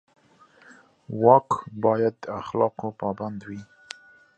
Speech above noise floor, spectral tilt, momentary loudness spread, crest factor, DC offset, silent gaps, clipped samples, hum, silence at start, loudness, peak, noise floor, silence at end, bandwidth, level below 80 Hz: 33 dB; -7.5 dB/octave; 24 LU; 24 dB; under 0.1%; none; under 0.1%; none; 1.1 s; -24 LUFS; -2 dBFS; -56 dBFS; 0.75 s; 8.8 kHz; -64 dBFS